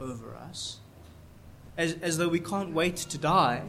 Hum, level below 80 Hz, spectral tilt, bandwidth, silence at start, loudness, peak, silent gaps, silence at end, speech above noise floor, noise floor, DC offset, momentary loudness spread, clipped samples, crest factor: none; -56 dBFS; -4.5 dB/octave; 16 kHz; 0 s; -29 LUFS; -10 dBFS; none; 0 s; 22 dB; -51 dBFS; under 0.1%; 17 LU; under 0.1%; 20 dB